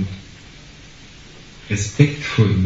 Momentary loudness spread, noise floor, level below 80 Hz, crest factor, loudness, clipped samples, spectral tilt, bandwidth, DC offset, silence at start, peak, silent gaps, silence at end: 24 LU; -41 dBFS; -44 dBFS; 20 dB; -19 LUFS; under 0.1%; -6.5 dB/octave; 8 kHz; under 0.1%; 0 s; 0 dBFS; none; 0 s